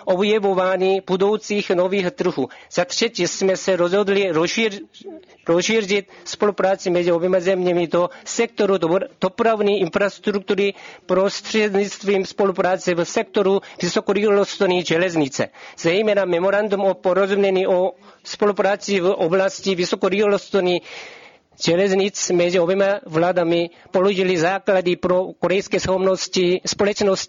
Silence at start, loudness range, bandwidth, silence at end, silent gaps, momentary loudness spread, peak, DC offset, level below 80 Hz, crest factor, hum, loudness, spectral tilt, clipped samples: 0 s; 1 LU; 7.6 kHz; 0 s; none; 5 LU; -4 dBFS; under 0.1%; -58 dBFS; 14 dB; none; -19 LUFS; -4.5 dB/octave; under 0.1%